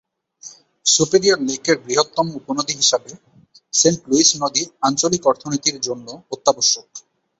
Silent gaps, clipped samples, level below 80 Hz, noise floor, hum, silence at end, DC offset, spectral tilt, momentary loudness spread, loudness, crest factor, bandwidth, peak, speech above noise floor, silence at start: none; under 0.1%; -60 dBFS; -43 dBFS; none; 0.4 s; under 0.1%; -2.5 dB/octave; 9 LU; -17 LUFS; 18 dB; 8.2 kHz; -2 dBFS; 24 dB; 0.45 s